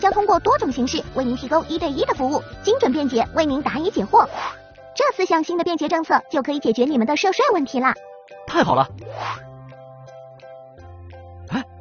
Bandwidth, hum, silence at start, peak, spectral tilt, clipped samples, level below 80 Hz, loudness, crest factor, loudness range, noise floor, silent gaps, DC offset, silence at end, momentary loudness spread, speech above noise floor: 7 kHz; none; 0 s; -2 dBFS; -3.5 dB/octave; under 0.1%; -48 dBFS; -20 LUFS; 18 dB; 6 LU; -41 dBFS; none; under 0.1%; 0 s; 22 LU; 22 dB